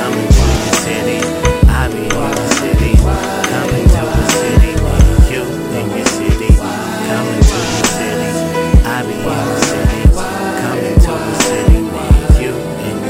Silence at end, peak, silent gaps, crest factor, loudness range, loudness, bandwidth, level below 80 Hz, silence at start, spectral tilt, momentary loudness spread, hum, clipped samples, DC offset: 0 s; 0 dBFS; none; 12 dB; 2 LU; -13 LUFS; 16 kHz; -14 dBFS; 0 s; -5 dB/octave; 6 LU; none; under 0.1%; under 0.1%